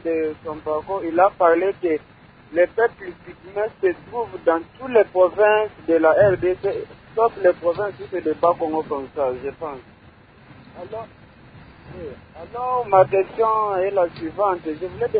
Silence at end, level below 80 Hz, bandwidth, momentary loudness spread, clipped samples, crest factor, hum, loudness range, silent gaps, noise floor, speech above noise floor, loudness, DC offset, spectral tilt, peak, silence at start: 0 s; -52 dBFS; 4.9 kHz; 19 LU; under 0.1%; 20 dB; none; 11 LU; none; -49 dBFS; 28 dB; -21 LUFS; under 0.1%; -11 dB/octave; -2 dBFS; 0.05 s